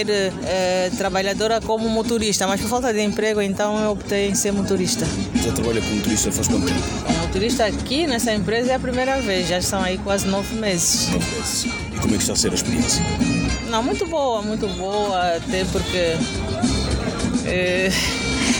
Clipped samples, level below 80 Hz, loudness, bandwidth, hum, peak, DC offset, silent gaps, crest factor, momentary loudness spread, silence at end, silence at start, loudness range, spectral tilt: under 0.1%; -36 dBFS; -20 LUFS; 17.5 kHz; none; -8 dBFS; under 0.1%; none; 14 dB; 4 LU; 0 s; 0 s; 2 LU; -4 dB/octave